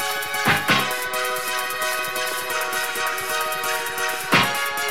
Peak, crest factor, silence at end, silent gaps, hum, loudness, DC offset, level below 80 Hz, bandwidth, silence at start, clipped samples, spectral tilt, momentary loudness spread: -2 dBFS; 20 dB; 0 s; none; none; -22 LUFS; 0.8%; -58 dBFS; 17.5 kHz; 0 s; under 0.1%; -2 dB/octave; 6 LU